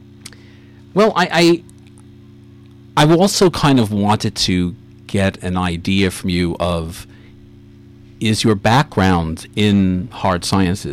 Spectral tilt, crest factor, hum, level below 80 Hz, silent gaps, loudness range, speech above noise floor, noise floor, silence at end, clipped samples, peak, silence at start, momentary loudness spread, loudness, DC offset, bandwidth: -5.5 dB/octave; 12 dB; none; -40 dBFS; none; 5 LU; 26 dB; -42 dBFS; 0 s; under 0.1%; -4 dBFS; 0.25 s; 9 LU; -16 LUFS; under 0.1%; 16 kHz